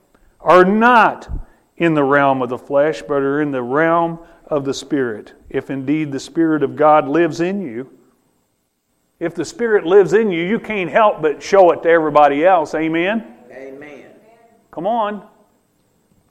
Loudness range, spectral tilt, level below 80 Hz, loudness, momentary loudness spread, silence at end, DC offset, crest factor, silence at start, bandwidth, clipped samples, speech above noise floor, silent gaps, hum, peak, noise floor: 6 LU; -6 dB/octave; -44 dBFS; -16 LUFS; 19 LU; 1.1 s; under 0.1%; 16 dB; 0.4 s; 11.5 kHz; under 0.1%; 51 dB; none; none; 0 dBFS; -67 dBFS